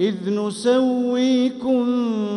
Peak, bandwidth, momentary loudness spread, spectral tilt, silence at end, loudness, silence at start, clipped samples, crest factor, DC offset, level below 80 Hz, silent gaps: -8 dBFS; 11 kHz; 4 LU; -6 dB/octave; 0 s; -20 LUFS; 0 s; under 0.1%; 12 dB; under 0.1%; -64 dBFS; none